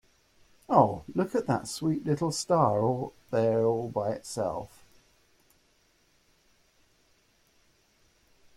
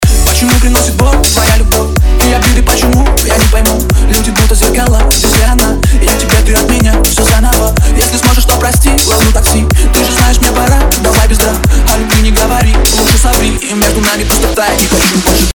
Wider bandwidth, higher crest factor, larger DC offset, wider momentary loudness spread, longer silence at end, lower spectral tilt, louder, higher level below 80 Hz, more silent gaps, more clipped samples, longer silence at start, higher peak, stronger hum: second, 16 kHz vs over 20 kHz; first, 22 dB vs 8 dB; neither; first, 9 LU vs 2 LU; first, 3.9 s vs 0 s; first, -6 dB/octave vs -4 dB/octave; second, -28 LUFS vs -8 LUFS; second, -64 dBFS vs -10 dBFS; neither; second, under 0.1% vs 1%; first, 0.7 s vs 0 s; second, -8 dBFS vs 0 dBFS; neither